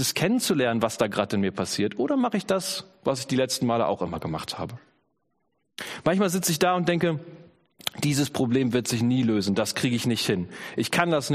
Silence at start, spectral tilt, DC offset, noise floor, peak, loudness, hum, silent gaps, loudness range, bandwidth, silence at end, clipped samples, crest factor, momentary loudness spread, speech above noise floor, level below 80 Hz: 0 s; -4.5 dB/octave; under 0.1%; -75 dBFS; -4 dBFS; -25 LUFS; none; none; 3 LU; 15.5 kHz; 0 s; under 0.1%; 20 dB; 9 LU; 50 dB; -60 dBFS